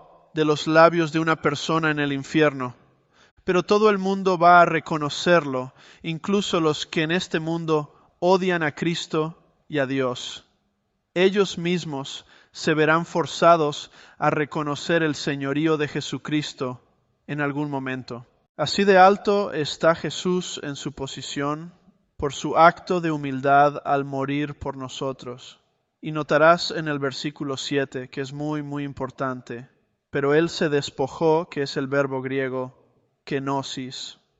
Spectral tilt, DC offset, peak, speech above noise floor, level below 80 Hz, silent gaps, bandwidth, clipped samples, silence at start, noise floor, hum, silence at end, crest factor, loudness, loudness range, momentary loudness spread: -5 dB/octave; under 0.1%; -2 dBFS; 50 dB; -58 dBFS; 3.31-3.37 s, 18.49-18.55 s; 8.2 kHz; under 0.1%; 0.35 s; -73 dBFS; none; 0.25 s; 22 dB; -23 LUFS; 6 LU; 15 LU